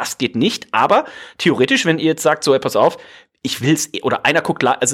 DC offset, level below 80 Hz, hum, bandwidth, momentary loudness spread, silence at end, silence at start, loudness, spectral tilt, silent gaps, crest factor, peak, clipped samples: under 0.1%; -62 dBFS; none; 16.5 kHz; 6 LU; 0 s; 0 s; -16 LUFS; -4 dB/octave; none; 16 dB; -2 dBFS; under 0.1%